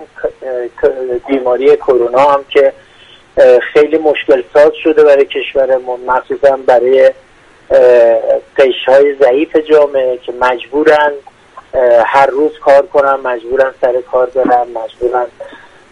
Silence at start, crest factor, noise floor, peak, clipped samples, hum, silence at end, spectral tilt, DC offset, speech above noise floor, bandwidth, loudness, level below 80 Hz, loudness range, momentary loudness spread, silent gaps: 0 s; 10 dB; -41 dBFS; 0 dBFS; 0.2%; none; 0.35 s; -5 dB/octave; under 0.1%; 31 dB; 9.4 kHz; -10 LUFS; -46 dBFS; 2 LU; 8 LU; none